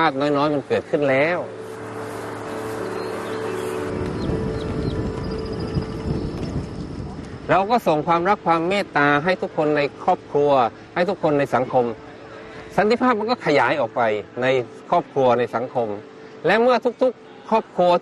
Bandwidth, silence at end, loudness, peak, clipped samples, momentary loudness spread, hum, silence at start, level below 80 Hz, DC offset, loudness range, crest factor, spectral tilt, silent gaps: 12.5 kHz; 0 s; -21 LUFS; -6 dBFS; under 0.1%; 13 LU; none; 0 s; -42 dBFS; under 0.1%; 7 LU; 14 dB; -6.5 dB/octave; none